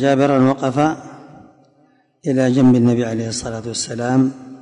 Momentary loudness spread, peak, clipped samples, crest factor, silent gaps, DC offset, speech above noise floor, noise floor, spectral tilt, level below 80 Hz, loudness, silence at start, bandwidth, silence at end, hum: 12 LU; -4 dBFS; under 0.1%; 14 dB; none; under 0.1%; 40 dB; -56 dBFS; -6 dB/octave; -52 dBFS; -17 LUFS; 0 s; 10.5 kHz; 0.05 s; none